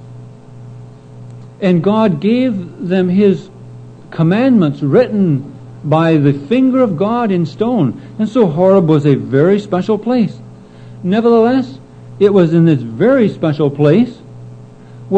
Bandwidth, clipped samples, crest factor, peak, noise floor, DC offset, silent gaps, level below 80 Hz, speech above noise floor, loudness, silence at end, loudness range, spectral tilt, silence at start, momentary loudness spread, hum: 8.4 kHz; under 0.1%; 12 dB; 0 dBFS; -35 dBFS; under 0.1%; none; -54 dBFS; 23 dB; -13 LUFS; 0 s; 3 LU; -9 dB/octave; 0 s; 10 LU; none